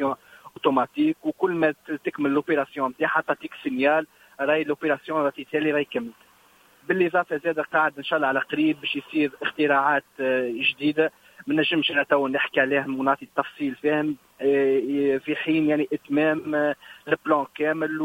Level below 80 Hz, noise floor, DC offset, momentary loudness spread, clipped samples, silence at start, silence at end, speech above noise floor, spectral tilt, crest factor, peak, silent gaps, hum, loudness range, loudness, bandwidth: -68 dBFS; -57 dBFS; under 0.1%; 7 LU; under 0.1%; 0 s; 0 s; 33 dB; -6.5 dB/octave; 18 dB; -6 dBFS; none; none; 2 LU; -24 LUFS; 16 kHz